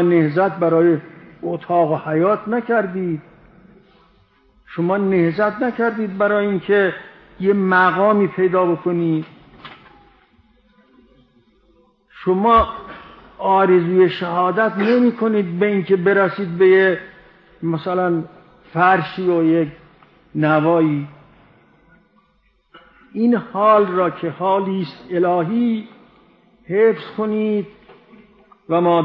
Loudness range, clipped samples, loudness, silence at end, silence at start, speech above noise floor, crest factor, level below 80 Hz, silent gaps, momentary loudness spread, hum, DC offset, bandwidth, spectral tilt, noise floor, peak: 6 LU; under 0.1%; -17 LUFS; 0 s; 0 s; 44 dB; 16 dB; -50 dBFS; none; 12 LU; none; under 0.1%; 5.4 kHz; -10 dB/octave; -60 dBFS; -2 dBFS